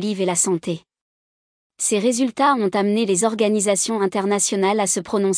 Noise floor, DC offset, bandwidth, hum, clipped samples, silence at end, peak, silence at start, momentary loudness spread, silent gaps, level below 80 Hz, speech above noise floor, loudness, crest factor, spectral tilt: under -90 dBFS; under 0.1%; 10.5 kHz; none; under 0.1%; 0 s; -6 dBFS; 0 s; 3 LU; 1.01-1.70 s; -68 dBFS; over 71 dB; -19 LUFS; 14 dB; -3.5 dB/octave